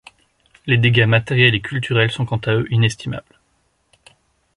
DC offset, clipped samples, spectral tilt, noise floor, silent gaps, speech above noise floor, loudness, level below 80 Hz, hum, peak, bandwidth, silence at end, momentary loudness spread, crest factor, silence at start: under 0.1%; under 0.1%; -6 dB/octave; -64 dBFS; none; 47 dB; -17 LUFS; -48 dBFS; none; -2 dBFS; 11 kHz; 1.35 s; 15 LU; 18 dB; 0.65 s